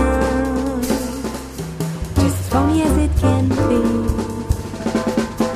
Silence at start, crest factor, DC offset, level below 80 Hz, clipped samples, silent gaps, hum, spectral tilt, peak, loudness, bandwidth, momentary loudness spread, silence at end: 0 s; 16 dB; under 0.1%; -26 dBFS; under 0.1%; none; none; -6.5 dB/octave; -4 dBFS; -19 LUFS; 15.5 kHz; 9 LU; 0 s